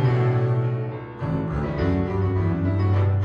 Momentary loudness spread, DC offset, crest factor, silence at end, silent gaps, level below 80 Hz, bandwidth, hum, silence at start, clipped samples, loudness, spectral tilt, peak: 7 LU; under 0.1%; 12 dB; 0 s; none; -38 dBFS; 5.2 kHz; none; 0 s; under 0.1%; -23 LUFS; -10 dB/octave; -10 dBFS